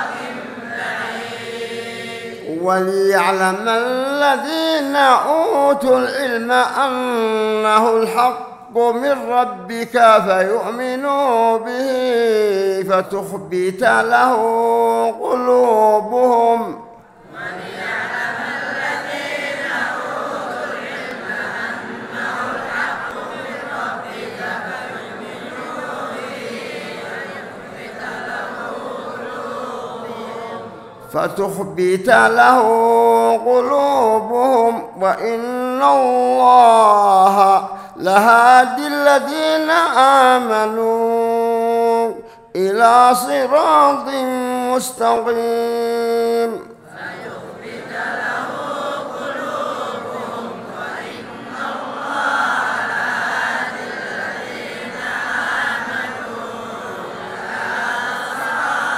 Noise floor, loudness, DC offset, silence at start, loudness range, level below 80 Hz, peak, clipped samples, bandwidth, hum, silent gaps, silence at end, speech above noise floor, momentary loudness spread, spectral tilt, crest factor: -41 dBFS; -16 LUFS; under 0.1%; 0 s; 13 LU; -62 dBFS; 0 dBFS; under 0.1%; 16 kHz; none; none; 0 s; 27 dB; 17 LU; -4 dB/octave; 16 dB